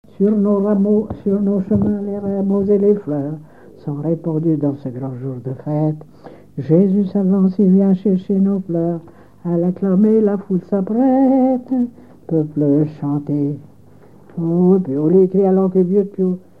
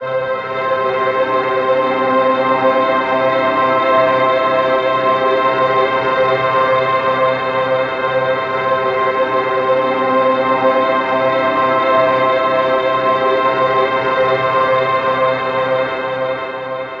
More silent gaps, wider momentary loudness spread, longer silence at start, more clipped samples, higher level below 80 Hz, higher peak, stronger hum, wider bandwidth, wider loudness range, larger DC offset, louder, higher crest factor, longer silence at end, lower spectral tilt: neither; first, 12 LU vs 4 LU; first, 0.2 s vs 0 s; neither; about the same, -54 dBFS vs -52 dBFS; about the same, -2 dBFS vs -2 dBFS; neither; second, 2.4 kHz vs 6.6 kHz; about the same, 4 LU vs 2 LU; first, 0.4% vs under 0.1%; about the same, -17 LUFS vs -15 LUFS; about the same, 14 dB vs 14 dB; first, 0.2 s vs 0 s; first, -12 dB/octave vs -6.5 dB/octave